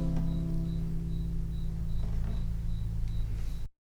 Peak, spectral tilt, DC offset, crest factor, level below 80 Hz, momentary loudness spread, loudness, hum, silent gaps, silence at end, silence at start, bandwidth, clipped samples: -20 dBFS; -8.5 dB/octave; under 0.1%; 10 dB; -32 dBFS; 4 LU; -36 LUFS; none; none; 0.1 s; 0 s; 7.6 kHz; under 0.1%